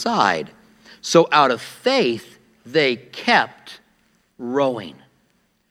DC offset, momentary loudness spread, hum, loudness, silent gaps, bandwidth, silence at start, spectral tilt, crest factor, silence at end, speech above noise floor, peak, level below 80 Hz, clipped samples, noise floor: under 0.1%; 17 LU; none; -19 LUFS; none; 15 kHz; 0 s; -4 dB/octave; 20 dB; 0.8 s; 45 dB; 0 dBFS; -70 dBFS; under 0.1%; -64 dBFS